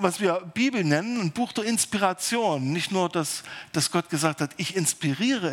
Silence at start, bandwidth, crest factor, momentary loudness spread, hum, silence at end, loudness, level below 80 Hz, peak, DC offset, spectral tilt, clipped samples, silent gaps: 0 s; 18 kHz; 20 dB; 4 LU; none; 0 s; -25 LUFS; -70 dBFS; -6 dBFS; under 0.1%; -4 dB/octave; under 0.1%; none